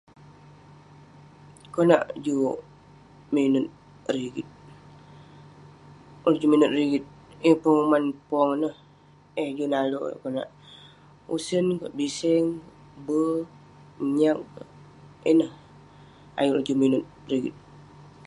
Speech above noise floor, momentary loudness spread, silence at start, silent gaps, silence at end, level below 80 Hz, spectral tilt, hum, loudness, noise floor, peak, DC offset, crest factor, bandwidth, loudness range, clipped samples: 31 dB; 16 LU; 1.75 s; none; 0.45 s; -64 dBFS; -6 dB/octave; 50 Hz at -60 dBFS; -25 LUFS; -54 dBFS; -4 dBFS; under 0.1%; 22 dB; 11.5 kHz; 6 LU; under 0.1%